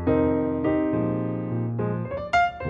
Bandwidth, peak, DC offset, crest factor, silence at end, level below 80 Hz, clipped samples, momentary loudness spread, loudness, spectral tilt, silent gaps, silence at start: 7.2 kHz; -10 dBFS; under 0.1%; 14 dB; 0 s; -46 dBFS; under 0.1%; 6 LU; -25 LUFS; -8 dB/octave; none; 0 s